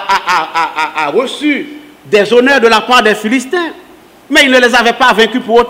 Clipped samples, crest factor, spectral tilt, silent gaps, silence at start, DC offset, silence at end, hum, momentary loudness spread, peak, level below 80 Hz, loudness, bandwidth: 0.7%; 10 dB; -3 dB/octave; none; 0 s; under 0.1%; 0 s; none; 8 LU; 0 dBFS; -46 dBFS; -9 LUFS; 16.5 kHz